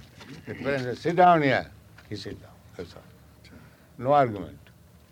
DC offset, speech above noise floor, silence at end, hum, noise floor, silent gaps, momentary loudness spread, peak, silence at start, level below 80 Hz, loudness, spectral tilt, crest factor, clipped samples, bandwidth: under 0.1%; 29 dB; 0.55 s; none; -53 dBFS; none; 25 LU; -6 dBFS; 0.2 s; -58 dBFS; -23 LUFS; -7 dB/octave; 20 dB; under 0.1%; 15.5 kHz